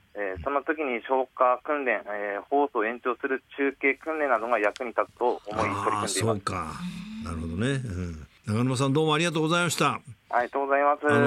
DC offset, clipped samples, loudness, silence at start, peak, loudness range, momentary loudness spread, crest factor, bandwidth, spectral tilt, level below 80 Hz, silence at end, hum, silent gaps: under 0.1%; under 0.1%; -27 LUFS; 0.15 s; -8 dBFS; 3 LU; 10 LU; 18 dB; 15.5 kHz; -5 dB/octave; -56 dBFS; 0 s; none; none